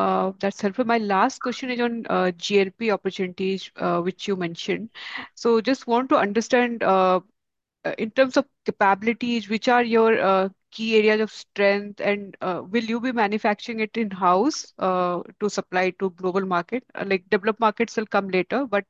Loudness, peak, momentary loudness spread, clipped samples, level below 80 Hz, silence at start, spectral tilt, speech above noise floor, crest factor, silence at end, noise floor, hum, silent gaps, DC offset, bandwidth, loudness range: -23 LUFS; -6 dBFS; 8 LU; under 0.1%; -70 dBFS; 0 s; -5 dB/octave; 60 dB; 18 dB; 0.05 s; -83 dBFS; none; none; under 0.1%; 8 kHz; 4 LU